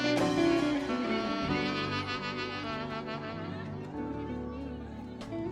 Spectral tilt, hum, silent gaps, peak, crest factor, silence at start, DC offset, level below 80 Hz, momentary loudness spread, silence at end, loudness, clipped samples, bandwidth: -5.5 dB/octave; none; none; -16 dBFS; 16 dB; 0 s; under 0.1%; -54 dBFS; 13 LU; 0 s; -33 LUFS; under 0.1%; 12.5 kHz